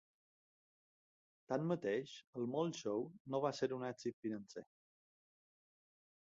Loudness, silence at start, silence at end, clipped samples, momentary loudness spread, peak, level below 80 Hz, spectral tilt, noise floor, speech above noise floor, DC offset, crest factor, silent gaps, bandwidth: -42 LUFS; 1.5 s; 1.75 s; under 0.1%; 9 LU; -24 dBFS; -86 dBFS; -5.5 dB/octave; under -90 dBFS; over 49 dB; under 0.1%; 20 dB; 2.27-2.33 s, 3.20-3.25 s, 4.13-4.22 s; 7.6 kHz